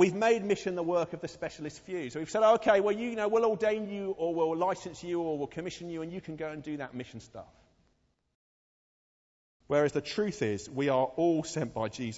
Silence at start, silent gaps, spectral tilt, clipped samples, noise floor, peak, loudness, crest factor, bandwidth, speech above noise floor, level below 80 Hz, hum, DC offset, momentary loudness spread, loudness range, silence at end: 0 s; 8.35-9.60 s; -5.5 dB/octave; under 0.1%; -73 dBFS; -12 dBFS; -31 LUFS; 20 dB; 8 kHz; 43 dB; -66 dBFS; none; under 0.1%; 13 LU; 14 LU; 0 s